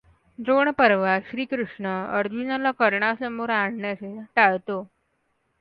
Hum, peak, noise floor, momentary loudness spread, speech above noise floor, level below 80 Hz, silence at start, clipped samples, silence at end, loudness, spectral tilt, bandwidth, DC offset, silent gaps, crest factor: none; -2 dBFS; -71 dBFS; 12 LU; 48 dB; -66 dBFS; 0.4 s; under 0.1%; 0.75 s; -23 LUFS; -8.5 dB/octave; 5.4 kHz; under 0.1%; none; 22 dB